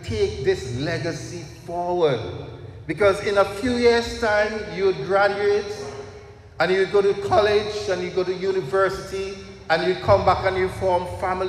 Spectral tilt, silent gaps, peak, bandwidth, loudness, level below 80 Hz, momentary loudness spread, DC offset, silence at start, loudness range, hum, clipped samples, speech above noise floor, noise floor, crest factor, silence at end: -5.5 dB/octave; none; -4 dBFS; 12.5 kHz; -22 LUFS; -44 dBFS; 14 LU; under 0.1%; 0 s; 3 LU; none; under 0.1%; 21 dB; -42 dBFS; 18 dB; 0 s